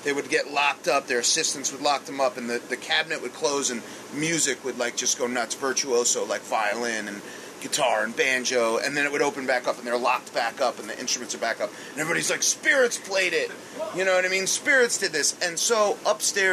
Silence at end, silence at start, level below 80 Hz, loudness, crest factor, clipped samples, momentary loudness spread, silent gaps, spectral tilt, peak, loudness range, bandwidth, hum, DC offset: 0 s; 0 s; -76 dBFS; -24 LUFS; 18 dB; under 0.1%; 8 LU; none; -1 dB/octave; -8 dBFS; 3 LU; 14 kHz; none; under 0.1%